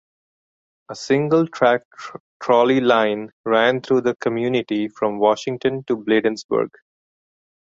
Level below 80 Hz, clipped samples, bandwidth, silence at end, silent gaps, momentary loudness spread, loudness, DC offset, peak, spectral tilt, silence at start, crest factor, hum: -64 dBFS; under 0.1%; 7.8 kHz; 1 s; 1.85-1.91 s, 2.20-2.40 s, 3.33-3.44 s, 6.44-6.49 s; 13 LU; -19 LUFS; under 0.1%; -2 dBFS; -6 dB/octave; 0.9 s; 18 dB; none